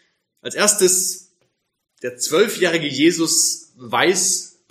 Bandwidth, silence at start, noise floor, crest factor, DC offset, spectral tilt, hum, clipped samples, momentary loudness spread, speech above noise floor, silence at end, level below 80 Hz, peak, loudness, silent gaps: 15.5 kHz; 0.45 s; -69 dBFS; 18 dB; under 0.1%; -2 dB/octave; none; under 0.1%; 15 LU; 51 dB; 0.25 s; -72 dBFS; -2 dBFS; -17 LUFS; none